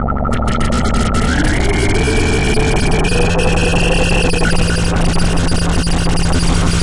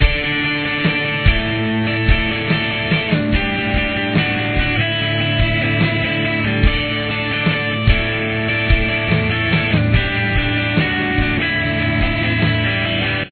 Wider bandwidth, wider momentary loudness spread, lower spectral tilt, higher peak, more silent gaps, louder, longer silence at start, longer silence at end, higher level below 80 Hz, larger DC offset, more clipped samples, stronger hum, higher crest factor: first, 11.5 kHz vs 4.5 kHz; about the same, 2 LU vs 2 LU; second, -5 dB/octave vs -9 dB/octave; about the same, -2 dBFS vs 0 dBFS; neither; about the same, -15 LUFS vs -17 LUFS; about the same, 0 s vs 0 s; about the same, 0 s vs 0 s; first, -18 dBFS vs -24 dBFS; neither; neither; neither; about the same, 12 dB vs 16 dB